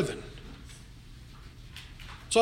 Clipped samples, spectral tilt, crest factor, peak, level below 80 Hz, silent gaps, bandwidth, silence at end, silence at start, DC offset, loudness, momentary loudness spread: under 0.1%; -3.5 dB/octave; 24 dB; -10 dBFS; -50 dBFS; none; 16 kHz; 0 s; 0 s; under 0.1%; -39 LUFS; 16 LU